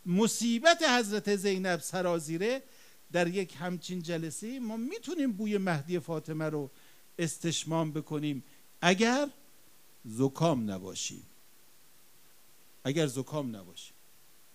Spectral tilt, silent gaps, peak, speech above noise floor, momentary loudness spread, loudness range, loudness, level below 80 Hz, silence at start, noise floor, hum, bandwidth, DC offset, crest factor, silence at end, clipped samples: -4.5 dB/octave; none; -8 dBFS; 31 dB; 13 LU; 7 LU; -31 LUFS; -78 dBFS; 0.05 s; -62 dBFS; none; 15.5 kHz; 0.1%; 24 dB; 0.65 s; under 0.1%